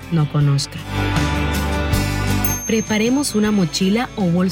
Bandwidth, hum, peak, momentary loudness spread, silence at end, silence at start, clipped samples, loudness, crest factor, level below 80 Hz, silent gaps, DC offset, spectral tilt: 18 kHz; none; -4 dBFS; 3 LU; 0 s; 0 s; under 0.1%; -19 LUFS; 14 dB; -30 dBFS; none; under 0.1%; -5 dB/octave